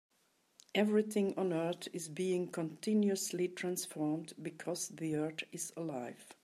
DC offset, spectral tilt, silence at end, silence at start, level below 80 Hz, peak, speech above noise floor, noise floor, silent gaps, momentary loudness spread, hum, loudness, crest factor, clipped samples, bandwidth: under 0.1%; -5 dB/octave; 0.1 s; 0.75 s; -86 dBFS; -20 dBFS; 39 dB; -75 dBFS; none; 10 LU; none; -37 LUFS; 18 dB; under 0.1%; 15 kHz